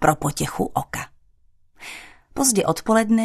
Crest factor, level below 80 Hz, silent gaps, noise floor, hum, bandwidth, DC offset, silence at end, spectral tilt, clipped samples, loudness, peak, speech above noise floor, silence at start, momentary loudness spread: 20 dB; -46 dBFS; none; -56 dBFS; none; 14 kHz; under 0.1%; 0 s; -4 dB/octave; under 0.1%; -21 LUFS; -2 dBFS; 35 dB; 0 s; 20 LU